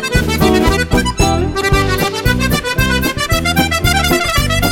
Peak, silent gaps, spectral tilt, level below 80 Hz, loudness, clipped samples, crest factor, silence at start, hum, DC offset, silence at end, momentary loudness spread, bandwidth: 0 dBFS; none; -4.5 dB/octave; -22 dBFS; -13 LUFS; under 0.1%; 14 dB; 0 s; none; under 0.1%; 0 s; 3 LU; 17 kHz